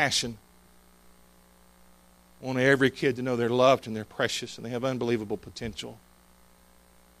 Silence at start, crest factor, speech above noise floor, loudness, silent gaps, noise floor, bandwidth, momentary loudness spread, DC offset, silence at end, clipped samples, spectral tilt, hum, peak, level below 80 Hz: 0 s; 22 dB; 31 dB; -27 LUFS; none; -58 dBFS; 15.5 kHz; 15 LU; under 0.1%; 1.25 s; under 0.1%; -4.5 dB/octave; 60 Hz at -55 dBFS; -8 dBFS; -60 dBFS